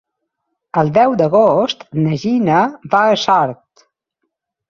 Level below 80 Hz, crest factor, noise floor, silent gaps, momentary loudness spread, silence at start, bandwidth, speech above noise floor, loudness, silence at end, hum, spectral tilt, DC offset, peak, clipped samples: -56 dBFS; 16 dB; -74 dBFS; none; 7 LU; 0.75 s; 7.4 kHz; 60 dB; -14 LUFS; 1.15 s; none; -6.5 dB/octave; under 0.1%; 0 dBFS; under 0.1%